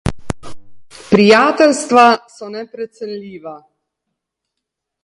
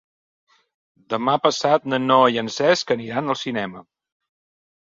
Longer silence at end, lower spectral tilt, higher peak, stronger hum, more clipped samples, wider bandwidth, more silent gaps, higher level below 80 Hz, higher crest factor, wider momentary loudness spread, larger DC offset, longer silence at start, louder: first, 1.45 s vs 1.15 s; about the same, -5 dB/octave vs -4.5 dB/octave; about the same, 0 dBFS vs -2 dBFS; neither; neither; first, 11.5 kHz vs 7.8 kHz; neither; first, -40 dBFS vs -64 dBFS; about the same, 16 dB vs 20 dB; first, 20 LU vs 11 LU; neither; second, 0.05 s vs 1.1 s; first, -11 LUFS vs -20 LUFS